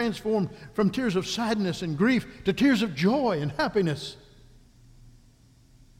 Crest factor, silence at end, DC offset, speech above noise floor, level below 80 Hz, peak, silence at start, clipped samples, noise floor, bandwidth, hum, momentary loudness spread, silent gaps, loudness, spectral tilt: 16 dB; 0.9 s; under 0.1%; 31 dB; -54 dBFS; -10 dBFS; 0 s; under 0.1%; -57 dBFS; 15.5 kHz; none; 7 LU; none; -26 LUFS; -6 dB/octave